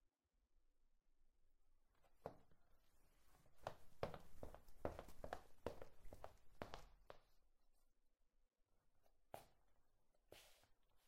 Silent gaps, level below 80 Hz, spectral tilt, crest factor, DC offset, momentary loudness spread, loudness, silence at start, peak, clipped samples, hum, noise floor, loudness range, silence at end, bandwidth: none; -70 dBFS; -5.5 dB/octave; 30 dB; under 0.1%; 13 LU; -59 LUFS; 0.05 s; -28 dBFS; under 0.1%; none; -85 dBFS; 9 LU; 0 s; 16 kHz